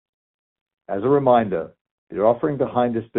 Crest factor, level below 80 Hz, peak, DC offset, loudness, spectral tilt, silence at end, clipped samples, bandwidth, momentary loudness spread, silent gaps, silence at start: 18 dB; -58 dBFS; -4 dBFS; under 0.1%; -20 LUFS; -6.5 dB/octave; 0 s; under 0.1%; 4 kHz; 14 LU; 1.81-1.85 s, 1.91-2.07 s; 0.9 s